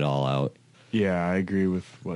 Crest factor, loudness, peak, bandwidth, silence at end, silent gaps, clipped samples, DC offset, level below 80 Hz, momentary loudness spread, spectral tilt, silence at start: 14 dB; -27 LUFS; -12 dBFS; 11 kHz; 0 s; none; under 0.1%; under 0.1%; -52 dBFS; 7 LU; -7.5 dB/octave; 0 s